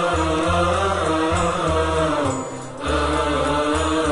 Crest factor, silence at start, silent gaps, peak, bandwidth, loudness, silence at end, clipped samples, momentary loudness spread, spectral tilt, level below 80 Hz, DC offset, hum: 12 dB; 0 s; none; -8 dBFS; 11 kHz; -20 LUFS; 0 s; under 0.1%; 5 LU; -5 dB/octave; -32 dBFS; 0.4%; none